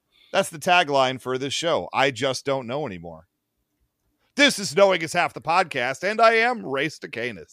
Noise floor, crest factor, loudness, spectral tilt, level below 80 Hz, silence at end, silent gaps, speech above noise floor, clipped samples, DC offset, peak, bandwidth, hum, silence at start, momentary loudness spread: -76 dBFS; 20 dB; -22 LUFS; -3 dB/octave; -66 dBFS; 0.1 s; none; 54 dB; under 0.1%; under 0.1%; -4 dBFS; 15.5 kHz; none; 0.35 s; 12 LU